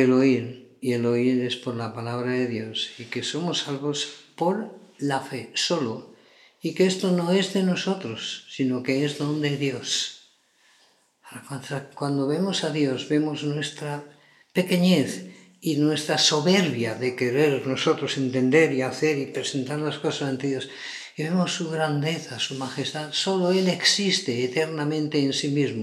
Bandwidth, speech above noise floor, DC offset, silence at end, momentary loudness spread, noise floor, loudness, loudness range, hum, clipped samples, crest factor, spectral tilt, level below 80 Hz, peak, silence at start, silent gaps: 14.5 kHz; 38 dB; under 0.1%; 0 s; 12 LU; -62 dBFS; -25 LUFS; 6 LU; none; under 0.1%; 20 dB; -4.5 dB/octave; -78 dBFS; -4 dBFS; 0 s; none